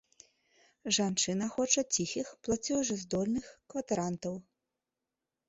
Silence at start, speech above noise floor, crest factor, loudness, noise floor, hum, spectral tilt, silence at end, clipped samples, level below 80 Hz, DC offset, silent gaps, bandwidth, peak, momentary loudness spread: 0.85 s; 56 dB; 24 dB; -32 LUFS; -89 dBFS; none; -3.5 dB/octave; 1.1 s; under 0.1%; -64 dBFS; under 0.1%; none; 8.4 kHz; -10 dBFS; 13 LU